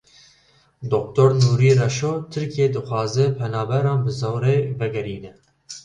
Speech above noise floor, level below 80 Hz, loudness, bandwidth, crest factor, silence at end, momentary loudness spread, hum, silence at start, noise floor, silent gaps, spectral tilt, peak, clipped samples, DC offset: 38 dB; -54 dBFS; -20 LUFS; 9.2 kHz; 18 dB; 0.05 s; 11 LU; none; 0.8 s; -58 dBFS; none; -6.5 dB/octave; -2 dBFS; under 0.1%; under 0.1%